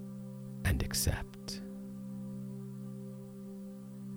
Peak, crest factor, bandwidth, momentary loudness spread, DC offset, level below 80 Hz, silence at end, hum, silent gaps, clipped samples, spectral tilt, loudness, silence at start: -16 dBFS; 24 dB; over 20 kHz; 14 LU; under 0.1%; -46 dBFS; 0 s; none; none; under 0.1%; -4.5 dB/octave; -39 LUFS; 0 s